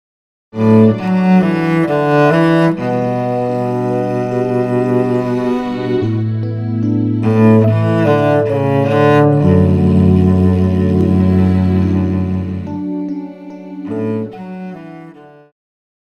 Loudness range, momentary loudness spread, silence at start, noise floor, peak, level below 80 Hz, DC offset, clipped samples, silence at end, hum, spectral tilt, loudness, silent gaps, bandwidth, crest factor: 8 LU; 13 LU; 0.55 s; -37 dBFS; 0 dBFS; -42 dBFS; under 0.1%; under 0.1%; 0.85 s; none; -9.5 dB/octave; -14 LUFS; none; 8.4 kHz; 14 dB